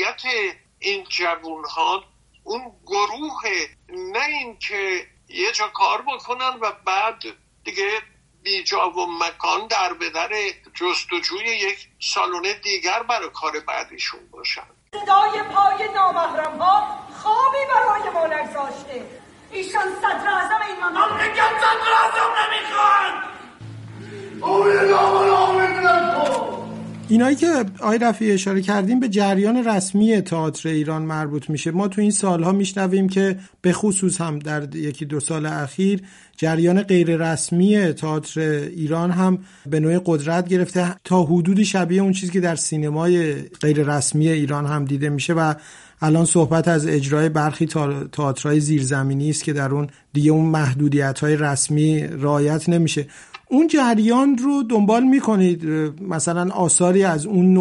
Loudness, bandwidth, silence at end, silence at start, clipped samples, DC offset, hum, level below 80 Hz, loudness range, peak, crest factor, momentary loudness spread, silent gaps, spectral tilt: -20 LUFS; 11.5 kHz; 0 s; 0 s; under 0.1%; under 0.1%; none; -60 dBFS; 5 LU; -4 dBFS; 16 dB; 11 LU; none; -5 dB/octave